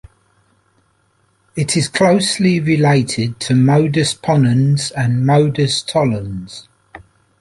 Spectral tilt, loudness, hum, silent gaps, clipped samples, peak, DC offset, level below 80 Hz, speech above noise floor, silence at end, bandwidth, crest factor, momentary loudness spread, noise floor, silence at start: -5.5 dB/octave; -15 LUFS; none; none; under 0.1%; -2 dBFS; under 0.1%; -48 dBFS; 45 dB; 0.45 s; 11.5 kHz; 14 dB; 10 LU; -60 dBFS; 1.55 s